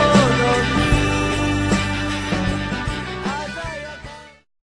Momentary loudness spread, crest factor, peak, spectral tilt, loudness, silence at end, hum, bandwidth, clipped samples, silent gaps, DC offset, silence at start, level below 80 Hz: 15 LU; 18 dB; -2 dBFS; -5 dB/octave; -20 LUFS; 0.35 s; none; 13 kHz; under 0.1%; none; under 0.1%; 0 s; -30 dBFS